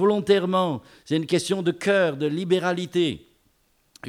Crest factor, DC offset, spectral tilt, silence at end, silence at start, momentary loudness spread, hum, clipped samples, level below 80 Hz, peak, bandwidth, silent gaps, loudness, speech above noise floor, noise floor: 18 dB; under 0.1%; -5.5 dB/octave; 0 s; 0 s; 7 LU; none; under 0.1%; -64 dBFS; -6 dBFS; 15 kHz; none; -23 LUFS; 42 dB; -65 dBFS